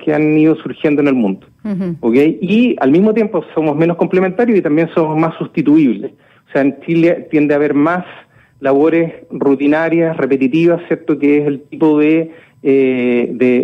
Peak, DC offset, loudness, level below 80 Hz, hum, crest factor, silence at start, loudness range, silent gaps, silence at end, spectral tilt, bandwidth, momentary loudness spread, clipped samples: -2 dBFS; under 0.1%; -13 LUFS; -58 dBFS; none; 10 dB; 0 s; 1 LU; none; 0 s; -9 dB/octave; 5.8 kHz; 9 LU; under 0.1%